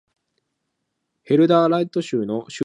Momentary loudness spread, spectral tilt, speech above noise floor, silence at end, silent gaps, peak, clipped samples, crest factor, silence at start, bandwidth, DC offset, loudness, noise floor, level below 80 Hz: 9 LU; -7 dB/octave; 58 dB; 0 s; none; -4 dBFS; under 0.1%; 18 dB; 1.3 s; 10 kHz; under 0.1%; -19 LUFS; -77 dBFS; -72 dBFS